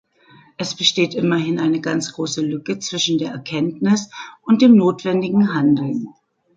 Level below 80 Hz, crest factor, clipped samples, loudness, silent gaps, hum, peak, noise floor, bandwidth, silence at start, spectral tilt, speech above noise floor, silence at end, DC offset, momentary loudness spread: -64 dBFS; 18 dB; under 0.1%; -18 LUFS; none; none; -2 dBFS; -50 dBFS; 9 kHz; 0.6 s; -5 dB/octave; 32 dB; 0.45 s; under 0.1%; 12 LU